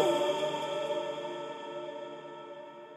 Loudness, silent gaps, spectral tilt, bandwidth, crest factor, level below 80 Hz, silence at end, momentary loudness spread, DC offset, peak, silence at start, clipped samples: -35 LUFS; none; -4 dB/octave; 15.5 kHz; 20 dB; -84 dBFS; 0 s; 15 LU; under 0.1%; -14 dBFS; 0 s; under 0.1%